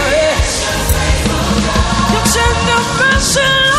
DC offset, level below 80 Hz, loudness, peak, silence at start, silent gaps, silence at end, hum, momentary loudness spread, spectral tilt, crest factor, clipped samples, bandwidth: under 0.1%; -20 dBFS; -12 LUFS; 0 dBFS; 0 s; none; 0 s; none; 4 LU; -3.5 dB/octave; 12 dB; under 0.1%; 15 kHz